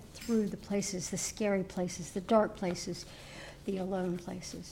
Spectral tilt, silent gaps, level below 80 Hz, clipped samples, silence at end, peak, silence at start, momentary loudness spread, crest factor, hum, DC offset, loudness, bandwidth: -5 dB/octave; none; -58 dBFS; under 0.1%; 0 s; -14 dBFS; 0 s; 13 LU; 20 dB; none; under 0.1%; -34 LUFS; 16.5 kHz